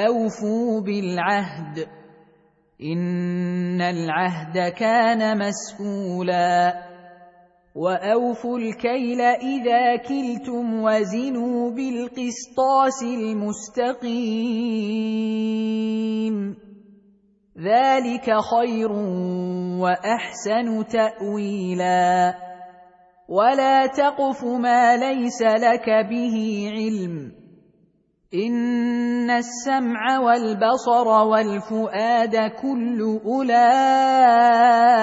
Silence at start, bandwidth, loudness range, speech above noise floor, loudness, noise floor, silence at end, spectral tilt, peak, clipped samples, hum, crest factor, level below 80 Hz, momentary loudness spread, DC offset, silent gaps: 0 s; 8 kHz; 6 LU; 42 dB; -21 LUFS; -62 dBFS; 0 s; -5.5 dB/octave; -4 dBFS; under 0.1%; none; 16 dB; -66 dBFS; 10 LU; under 0.1%; none